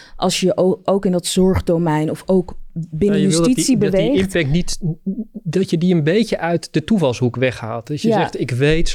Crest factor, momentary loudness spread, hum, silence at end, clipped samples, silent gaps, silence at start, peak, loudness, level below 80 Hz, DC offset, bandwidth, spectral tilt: 10 dB; 8 LU; none; 0 s; under 0.1%; none; 0 s; -6 dBFS; -17 LUFS; -34 dBFS; under 0.1%; 15 kHz; -5.5 dB/octave